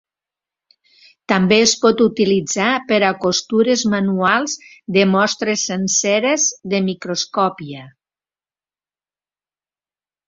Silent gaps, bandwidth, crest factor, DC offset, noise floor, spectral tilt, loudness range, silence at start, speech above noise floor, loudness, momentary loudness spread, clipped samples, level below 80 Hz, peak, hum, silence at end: none; 7.8 kHz; 18 dB; under 0.1%; under -90 dBFS; -3.5 dB/octave; 9 LU; 1.3 s; over 73 dB; -16 LUFS; 7 LU; under 0.1%; -60 dBFS; -2 dBFS; none; 2.4 s